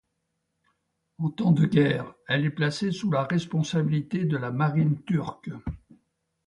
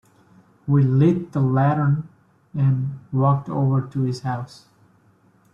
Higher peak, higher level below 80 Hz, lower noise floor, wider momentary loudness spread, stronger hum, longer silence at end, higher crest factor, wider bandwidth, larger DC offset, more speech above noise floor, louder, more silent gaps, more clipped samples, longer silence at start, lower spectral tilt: about the same, -8 dBFS vs -6 dBFS; about the same, -54 dBFS vs -58 dBFS; first, -78 dBFS vs -57 dBFS; about the same, 14 LU vs 13 LU; neither; second, 0.7 s vs 1.1 s; about the same, 20 dB vs 16 dB; first, 10.5 kHz vs 7 kHz; neither; first, 53 dB vs 38 dB; second, -26 LUFS vs -21 LUFS; neither; neither; first, 1.2 s vs 0.65 s; second, -7 dB/octave vs -9.5 dB/octave